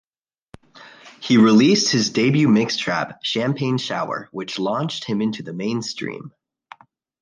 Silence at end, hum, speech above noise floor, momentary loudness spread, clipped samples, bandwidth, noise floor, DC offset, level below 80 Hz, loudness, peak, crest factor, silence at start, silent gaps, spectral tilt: 0.9 s; none; 60 dB; 14 LU; under 0.1%; 9.8 kHz; -80 dBFS; under 0.1%; -62 dBFS; -19 LUFS; -4 dBFS; 16 dB; 0.75 s; none; -5 dB/octave